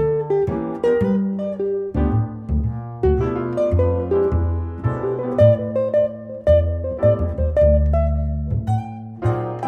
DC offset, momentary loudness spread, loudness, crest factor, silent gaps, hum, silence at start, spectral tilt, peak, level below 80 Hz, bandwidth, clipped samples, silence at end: under 0.1%; 8 LU; -20 LUFS; 16 dB; none; none; 0 s; -10.5 dB/octave; -2 dBFS; -26 dBFS; 4 kHz; under 0.1%; 0 s